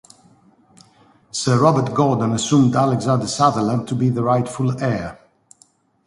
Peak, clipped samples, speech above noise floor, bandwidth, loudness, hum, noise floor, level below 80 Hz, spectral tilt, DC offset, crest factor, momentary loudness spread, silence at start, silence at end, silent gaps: 0 dBFS; under 0.1%; 39 dB; 11.5 kHz; -18 LUFS; none; -57 dBFS; -52 dBFS; -6 dB/octave; under 0.1%; 18 dB; 8 LU; 1.35 s; 0.95 s; none